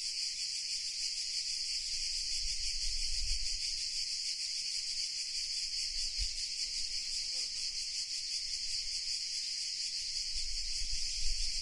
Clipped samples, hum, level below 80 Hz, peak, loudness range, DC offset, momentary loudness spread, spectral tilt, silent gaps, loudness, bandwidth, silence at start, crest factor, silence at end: under 0.1%; none; -46 dBFS; -20 dBFS; 1 LU; under 0.1%; 1 LU; 2.5 dB/octave; none; -34 LUFS; 11.5 kHz; 0 s; 16 dB; 0 s